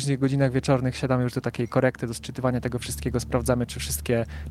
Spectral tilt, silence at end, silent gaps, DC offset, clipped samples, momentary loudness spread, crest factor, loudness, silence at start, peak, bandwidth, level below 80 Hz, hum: -6 dB/octave; 0 s; none; under 0.1%; under 0.1%; 6 LU; 18 dB; -26 LUFS; 0 s; -8 dBFS; 16 kHz; -40 dBFS; none